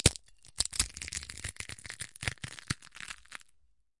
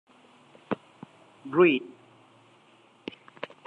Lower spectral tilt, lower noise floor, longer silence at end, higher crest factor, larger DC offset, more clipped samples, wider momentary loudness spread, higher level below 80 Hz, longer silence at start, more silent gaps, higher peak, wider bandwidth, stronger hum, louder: second, -2 dB/octave vs -7.5 dB/octave; first, -70 dBFS vs -59 dBFS; first, 0.65 s vs 0.2 s; first, 34 dB vs 22 dB; first, 0.1% vs under 0.1%; neither; second, 17 LU vs 26 LU; first, -50 dBFS vs -80 dBFS; second, 0.05 s vs 0.7 s; neither; first, -4 dBFS vs -8 dBFS; first, 11.5 kHz vs 4.8 kHz; neither; second, -36 LUFS vs -26 LUFS